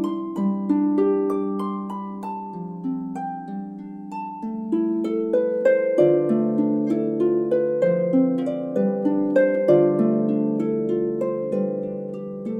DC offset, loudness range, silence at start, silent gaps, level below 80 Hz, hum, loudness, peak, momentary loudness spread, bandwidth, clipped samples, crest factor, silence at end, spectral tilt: under 0.1%; 8 LU; 0 s; none; -70 dBFS; none; -22 LUFS; -6 dBFS; 13 LU; 8 kHz; under 0.1%; 16 dB; 0 s; -9.5 dB/octave